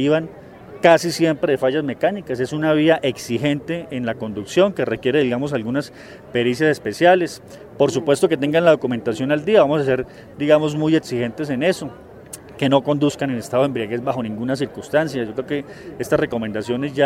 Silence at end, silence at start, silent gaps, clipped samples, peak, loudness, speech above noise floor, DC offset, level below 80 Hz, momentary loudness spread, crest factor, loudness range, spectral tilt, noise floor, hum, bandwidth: 0 s; 0 s; none; under 0.1%; 0 dBFS; -19 LUFS; 20 dB; under 0.1%; -54 dBFS; 11 LU; 18 dB; 4 LU; -6 dB/octave; -39 dBFS; none; 16 kHz